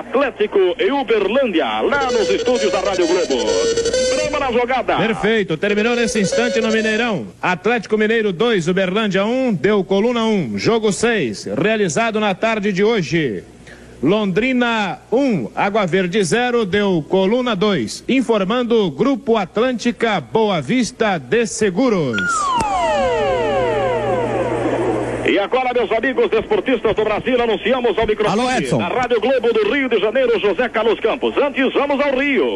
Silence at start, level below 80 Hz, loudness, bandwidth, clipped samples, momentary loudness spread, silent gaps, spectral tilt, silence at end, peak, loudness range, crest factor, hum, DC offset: 0 s; -44 dBFS; -17 LUFS; 11.5 kHz; under 0.1%; 3 LU; none; -4.5 dB/octave; 0 s; -2 dBFS; 1 LU; 14 dB; none; under 0.1%